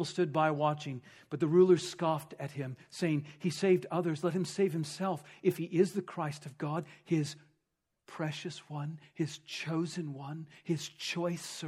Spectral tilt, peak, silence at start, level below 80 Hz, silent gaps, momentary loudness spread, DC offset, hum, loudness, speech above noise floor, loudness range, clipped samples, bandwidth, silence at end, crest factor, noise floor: -6 dB/octave; -14 dBFS; 0 s; -80 dBFS; none; 13 LU; under 0.1%; none; -33 LUFS; 51 dB; 8 LU; under 0.1%; 14.5 kHz; 0 s; 18 dB; -84 dBFS